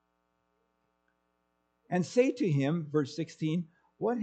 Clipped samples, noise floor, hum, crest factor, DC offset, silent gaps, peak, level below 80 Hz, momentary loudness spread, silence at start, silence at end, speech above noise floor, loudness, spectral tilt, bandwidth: under 0.1%; -77 dBFS; none; 20 dB; under 0.1%; none; -12 dBFS; -80 dBFS; 8 LU; 1.9 s; 0 s; 48 dB; -31 LUFS; -7 dB/octave; 8.8 kHz